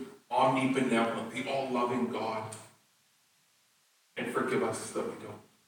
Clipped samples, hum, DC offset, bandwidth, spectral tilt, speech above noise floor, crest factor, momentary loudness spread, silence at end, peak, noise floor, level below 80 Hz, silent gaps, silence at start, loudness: under 0.1%; none; under 0.1%; 18.5 kHz; -5 dB/octave; 38 dB; 20 dB; 16 LU; 0.25 s; -14 dBFS; -69 dBFS; -78 dBFS; none; 0 s; -32 LUFS